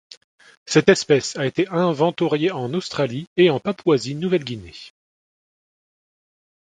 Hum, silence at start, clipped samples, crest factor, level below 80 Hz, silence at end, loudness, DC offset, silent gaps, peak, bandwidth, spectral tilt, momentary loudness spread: none; 0.65 s; under 0.1%; 22 dB; -58 dBFS; 1.7 s; -20 LUFS; under 0.1%; 3.27-3.36 s; 0 dBFS; 9.6 kHz; -5.5 dB/octave; 9 LU